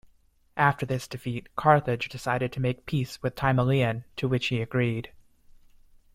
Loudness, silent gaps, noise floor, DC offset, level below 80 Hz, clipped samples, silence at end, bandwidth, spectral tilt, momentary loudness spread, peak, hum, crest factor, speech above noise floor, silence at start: -27 LUFS; none; -62 dBFS; under 0.1%; -54 dBFS; under 0.1%; 1.05 s; 15 kHz; -6.5 dB/octave; 11 LU; -6 dBFS; none; 22 dB; 36 dB; 0.55 s